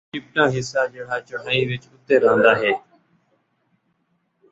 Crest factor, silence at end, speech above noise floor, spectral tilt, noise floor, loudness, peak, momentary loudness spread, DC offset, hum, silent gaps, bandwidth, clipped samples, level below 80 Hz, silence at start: 20 dB; 1.75 s; 49 dB; -5 dB/octave; -69 dBFS; -20 LUFS; -2 dBFS; 13 LU; under 0.1%; none; none; 8 kHz; under 0.1%; -60 dBFS; 0.15 s